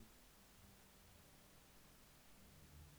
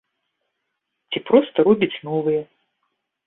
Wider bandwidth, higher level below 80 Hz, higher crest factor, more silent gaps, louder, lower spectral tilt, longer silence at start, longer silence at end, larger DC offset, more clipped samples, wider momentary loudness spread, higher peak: first, over 20 kHz vs 4 kHz; second, -72 dBFS vs -66 dBFS; about the same, 16 dB vs 20 dB; neither; second, -65 LUFS vs -20 LUFS; second, -3.5 dB/octave vs -10.5 dB/octave; second, 0 s vs 1.1 s; second, 0 s vs 0.8 s; neither; neither; second, 2 LU vs 11 LU; second, -50 dBFS vs -2 dBFS